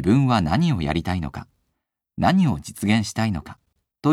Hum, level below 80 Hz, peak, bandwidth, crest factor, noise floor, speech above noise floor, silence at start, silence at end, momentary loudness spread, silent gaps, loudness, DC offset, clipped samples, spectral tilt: none; -42 dBFS; -4 dBFS; 14.5 kHz; 18 dB; -78 dBFS; 57 dB; 0 s; 0 s; 13 LU; none; -22 LUFS; under 0.1%; under 0.1%; -6.5 dB/octave